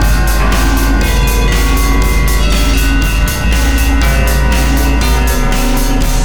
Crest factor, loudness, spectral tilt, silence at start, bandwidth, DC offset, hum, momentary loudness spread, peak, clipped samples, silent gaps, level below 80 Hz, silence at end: 10 dB; -12 LUFS; -4.5 dB/octave; 0 s; over 20 kHz; 5%; none; 2 LU; 0 dBFS; under 0.1%; none; -12 dBFS; 0 s